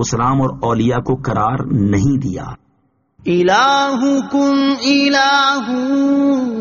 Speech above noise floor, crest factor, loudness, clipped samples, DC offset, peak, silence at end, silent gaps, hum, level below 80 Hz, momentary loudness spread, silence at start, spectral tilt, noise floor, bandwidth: 46 dB; 14 dB; -15 LUFS; under 0.1%; under 0.1%; -2 dBFS; 0 s; none; none; -42 dBFS; 7 LU; 0 s; -4.5 dB/octave; -61 dBFS; 7.4 kHz